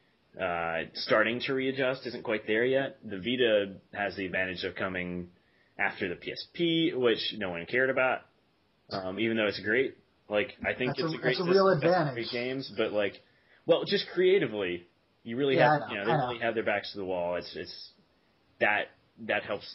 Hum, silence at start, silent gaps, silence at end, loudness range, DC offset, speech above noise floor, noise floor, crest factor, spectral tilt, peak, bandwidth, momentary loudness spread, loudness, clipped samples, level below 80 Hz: none; 0.35 s; none; 0 s; 4 LU; under 0.1%; 40 dB; -69 dBFS; 20 dB; -3 dB/octave; -10 dBFS; 5.8 kHz; 12 LU; -29 LUFS; under 0.1%; -68 dBFS